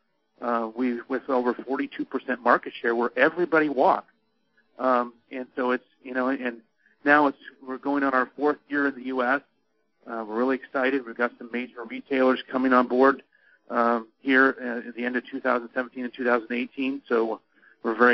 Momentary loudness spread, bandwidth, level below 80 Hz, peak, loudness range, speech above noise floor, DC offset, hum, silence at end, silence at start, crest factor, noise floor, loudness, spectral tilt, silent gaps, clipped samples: 12 LU; 6 kHz; -76 dBFS; -4 dBFS; 4 LU; 48 dB; under 0.1%; none; 0 s; 0.4 s; 22 dB; -73 dBFS; -25 LUFS; -2.5 dB/octave; none; under 0.1%